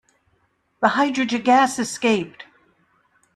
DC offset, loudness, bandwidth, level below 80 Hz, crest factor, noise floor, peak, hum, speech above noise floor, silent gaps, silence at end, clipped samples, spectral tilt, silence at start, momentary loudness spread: under 0.1%; -20 LUFS; 13 kHz; -66 dBFS; 18 dB; -66 dBFS; -4 dBFS; none; 47 dB; none; 0.9 s; under 0.1%; -3.5 dB/octave; 0.8 s; 6 LU